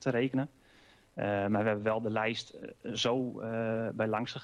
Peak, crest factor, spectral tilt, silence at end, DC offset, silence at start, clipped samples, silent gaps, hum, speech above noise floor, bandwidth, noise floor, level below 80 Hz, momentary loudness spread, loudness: -16 dBFS; 16 dB; -5.5 dB/octave; 0 s; under 0.1%; 0 s; under 0.1%; none; none; 29 dB; 10.5 kHz; -62 dBFS; -68 dBFS; 10 LU; -33 LUFS